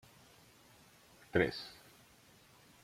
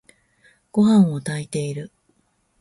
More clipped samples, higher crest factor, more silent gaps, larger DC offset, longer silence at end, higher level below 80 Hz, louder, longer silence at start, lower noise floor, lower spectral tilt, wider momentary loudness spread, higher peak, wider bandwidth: neither; first, 28 dB vs 16 dB; neither; neither; first, 1.1 s vs 0.75 s; second, -68 dBFS vs -62 dBFS; second, -37 LUFS vs -20 LUFS; first, 1.35 s vs 0.75 s; about the same, -64 dBFS vs -66 dBFS; second, -5.5 dB/octave vs -7 dB/octave; first, 28 LU vs 17 LU; second, -14 dBFS vs -6 dBFS; first, 16.5 kHz vs 11.5 kHz